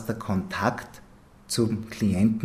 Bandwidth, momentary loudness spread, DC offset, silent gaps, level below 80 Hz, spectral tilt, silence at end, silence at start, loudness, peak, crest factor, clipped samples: 15.5 kHz; 10 LU; under 0.1%; none; -54 dBFS; -5.5 dB/octave; 0 s; 0 s; -27 LUFS; -8 dBFS; 20 dB; under 0.1%